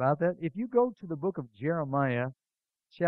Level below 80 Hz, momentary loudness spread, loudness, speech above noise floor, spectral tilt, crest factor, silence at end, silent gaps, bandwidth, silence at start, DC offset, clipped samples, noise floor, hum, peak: -72 dBFS; 7 LU; -31 LUFS; 43 dB; -11 dB/octave; 18 dB; 0 s; none; 5.4 kHz; 0 s; under 0.1%; under 0.1%; -73 dBFS; none; -12 dBFS